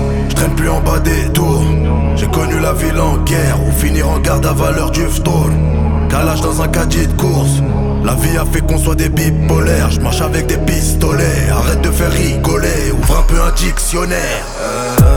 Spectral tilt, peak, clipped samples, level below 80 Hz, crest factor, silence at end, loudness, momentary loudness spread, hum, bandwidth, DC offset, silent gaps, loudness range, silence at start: -5.5 dB/octave; 0 dBFS; under 0.1%; -16 dBFS; 12 dB; 0 s; -14 LUFS; 2 LU; none; 19.5 kHz; under 0.1%; none; 1 LU; 0 s